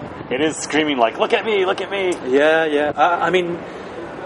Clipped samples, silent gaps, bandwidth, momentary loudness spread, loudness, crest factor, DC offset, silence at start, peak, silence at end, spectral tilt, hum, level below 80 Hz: under 0.1%; none; 11.5 kHz; 11 LU; -18 LUFS; 18 dB; under 0.1%; 0 s; 0 dBFS; 0 s; -4 dB/octave; none; -56 dBFS